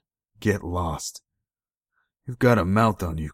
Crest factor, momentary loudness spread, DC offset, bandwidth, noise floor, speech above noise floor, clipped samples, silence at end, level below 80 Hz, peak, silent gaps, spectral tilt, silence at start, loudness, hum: 20 dB; 15 LU; under 0.1%; 16 kHz; under -90 dBFS; over 67 dB; under 0.1%; 0 s; -46 dBFS; -4 dBFS; 1.77-1.81 s; -6.5 dB/octave; 0.4 s; -24 LUFS; none